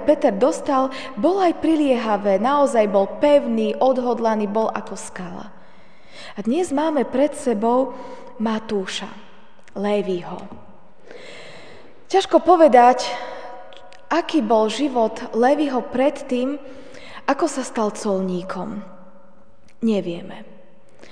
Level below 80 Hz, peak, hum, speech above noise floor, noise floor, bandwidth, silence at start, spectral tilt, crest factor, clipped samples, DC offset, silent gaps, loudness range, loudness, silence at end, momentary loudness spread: -60 dBFS; 0 dBFS; none; 35 dB; -54 dBFS; 10 kHz; 0 s; -5 dB/octave; 20 dB; under 0.1%; 1%; none; 9 LU; -20 LUFS; 0.7 s; 20 LU